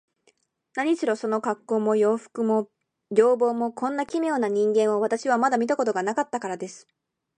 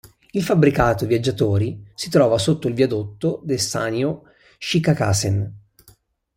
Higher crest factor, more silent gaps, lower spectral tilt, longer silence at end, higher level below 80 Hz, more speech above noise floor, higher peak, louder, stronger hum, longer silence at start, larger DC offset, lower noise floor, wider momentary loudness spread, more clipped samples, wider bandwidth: about the same, 18 dB vs 18 dB; neither; about the same, -5.5 dB/octave vs -5.5 dB/octave; second, 0.6 s vs 0.8 s; second, -78 dBFS vs -44 dBFS; first, 43 dB vs 36 dB; second, -6 dBFS vs -2 dBFS; second, -24 LUFS vs -20 LUFS; neither; first, 0.75 s vs 0.35 s; neither; first, -67 dBFS vs -55 dBFS; about the same, 8 LU vs 10 LU; neither; second, 10 kHz vs 16.5 kHz